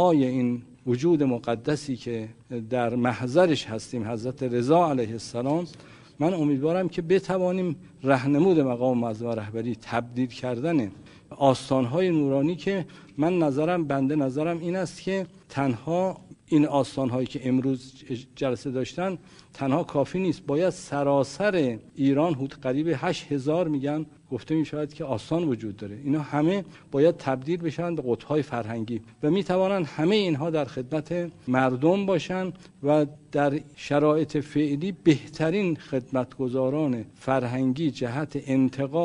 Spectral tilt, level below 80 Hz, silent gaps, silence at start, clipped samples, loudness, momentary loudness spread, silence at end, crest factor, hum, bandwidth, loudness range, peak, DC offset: -7 dB/octave; -60 dBFS; none; 0 s; under 0.1%; -26 LUFS; 9 LU; 0 s; 20 dB; none; 10.5 kHz; 3 LU; -6 dBFS; under 0.1%